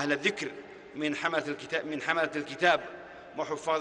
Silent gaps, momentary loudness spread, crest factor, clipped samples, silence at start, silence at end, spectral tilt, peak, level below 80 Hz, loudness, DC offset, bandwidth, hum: none; 17 LU; 22 dB; under 0.1%; 0 s; 0 s; -4 dB/octave; -10 dBFS; -72 dBFS; -30 LUFS; under 0.1%; 10.5 kHz; none